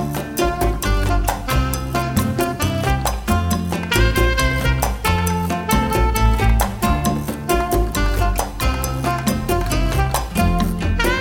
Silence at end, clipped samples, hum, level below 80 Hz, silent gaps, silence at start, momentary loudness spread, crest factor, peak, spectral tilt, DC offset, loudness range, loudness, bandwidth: 0 s; under 0.1%; none; -22 dBFS; none; 0 s; 4 LU; 16 dB; -2 dBFS; -5 dB/octave; under 0.1%; 2 LU; -19 LUFS; over 20 kHz